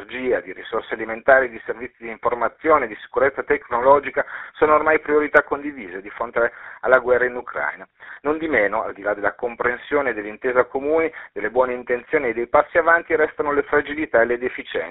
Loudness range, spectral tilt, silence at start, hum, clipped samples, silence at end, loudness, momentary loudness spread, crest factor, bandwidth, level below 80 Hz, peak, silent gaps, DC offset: 3 LU; -3 dB/octave; 0 s; none; under 0.1%; 0 s; -20 LUFS; 12 LU; 20 dB; 4 kHz; -52 dBFS; 0 dBFS; none; under 0.1%